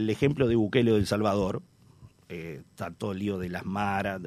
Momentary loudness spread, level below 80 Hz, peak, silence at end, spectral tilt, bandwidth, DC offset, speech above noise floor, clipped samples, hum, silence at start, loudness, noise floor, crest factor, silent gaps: 16 LU; -52 dBFS; -8 dBFS; 0 s; -7 dB/octave; 14 kHz; under 0.1%; 27 dB; under 0.1%; none; 0 s; -27 LUFS; -54 dBFS; 20 dB; none